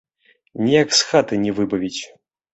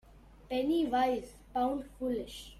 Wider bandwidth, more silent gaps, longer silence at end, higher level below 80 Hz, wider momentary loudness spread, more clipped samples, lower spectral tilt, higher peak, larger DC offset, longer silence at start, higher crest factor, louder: second, 8.2 kHz vs 15 kHz; neither; first, 0.45 s vs 0 s; about the same, -56 dBFS vs -56 dBFS; first, 17 LU vs 9 LU; neither; second, -3.5 dB/octave vs -5 dB/octave; first, -2 dBFS vs -18 dBFS; neither; first, 0.55 s vs 0.15 s; about the same, 18 dB vs 16 dB; first, -18 LUFS vs -33 LUFS